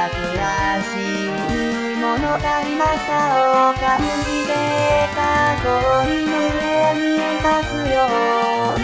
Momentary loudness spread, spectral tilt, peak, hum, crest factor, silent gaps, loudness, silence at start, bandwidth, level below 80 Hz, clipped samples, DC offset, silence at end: 5 LU; -5 dB/octave; -4 dBFS; none; 14 dB; none; -18 LUFS; 0 s; 8 kHz; -36 dBFS; under 0.1%; 0.2%; 0 s